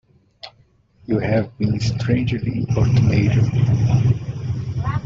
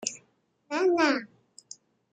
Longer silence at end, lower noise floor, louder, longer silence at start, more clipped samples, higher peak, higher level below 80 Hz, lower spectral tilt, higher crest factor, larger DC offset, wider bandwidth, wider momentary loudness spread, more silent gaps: second, 0 s vs 0.85 s; second, -56 dBFS vs -69 dBFS; first, -19 LUFS vs -27 LUFS; first, 0.45 s vs 0 s; neither; first, -4 dBFS vs -10 dBFS; first, -40 dBFS vs -76 dBFS; first, -8 dB/octave vs -2 dB/octave; second, 16 dB vs 22 dB; neither; second, 7.4 kHz vs 9.4 kHz; second, 10 LU vs 25 LU; neither